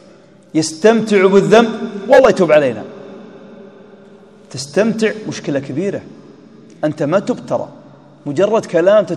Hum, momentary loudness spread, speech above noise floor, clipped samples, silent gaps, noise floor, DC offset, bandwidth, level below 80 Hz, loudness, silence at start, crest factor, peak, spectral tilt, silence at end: none; 19 LU; 31 dB; 0.3%; none; -44 dBFS; 0.1%; 12 kHz; -56 dBFS; -14 LUFS; 0.55 s; 16 dB; 0 dBFS; -5.5 dB/octave; 0 s